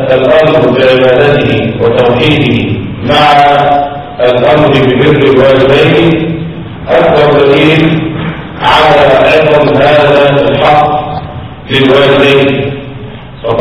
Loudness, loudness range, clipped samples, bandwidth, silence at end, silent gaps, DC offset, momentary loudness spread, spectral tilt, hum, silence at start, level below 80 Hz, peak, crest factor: -6 LUFS; 2 LU; 3%; 11 kHz; 0 s; none; 1%; 12 LU; -7 dB/octave; none; 0 s; -32 dBFS; 0 dBFS; 6 dB